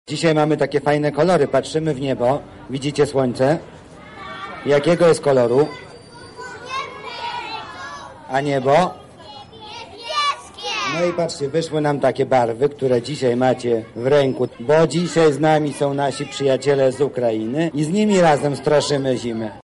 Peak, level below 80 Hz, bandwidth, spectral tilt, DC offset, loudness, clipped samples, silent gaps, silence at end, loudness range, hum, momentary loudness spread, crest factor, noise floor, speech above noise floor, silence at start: -6 dBFS; -54 dBFS; 11.5 kHz; -5.5 dB/octave; under 0.1%; -19 LUFS; under 0.1%; none; 0 s; 5 LU; none; 17 LU; 12 dB; -40 dBFS; 22 dB; 0.1 s